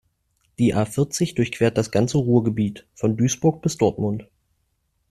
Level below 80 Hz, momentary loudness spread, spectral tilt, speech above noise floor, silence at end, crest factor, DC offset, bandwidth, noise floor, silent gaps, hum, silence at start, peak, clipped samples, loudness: -52 dBFS; 7 LU; -6 dB/octave; 50 dB; 0.85 s; 18 dB; under 0.1%; 13.5 kHz; -70 dBFS; none; none; 0.6 s; -4 dBFS; under 0.1%; -22 LUFS